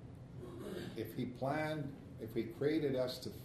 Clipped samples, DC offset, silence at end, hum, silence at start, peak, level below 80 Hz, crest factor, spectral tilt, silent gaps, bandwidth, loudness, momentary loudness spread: under 0.1%; under 0.1%; 0 s; none; 0 s; -24 dBFS; -64 dBFS; 18 dB; -6.5 dB/octave; none; 13.5 kHz; -40 LUFS; 13 LU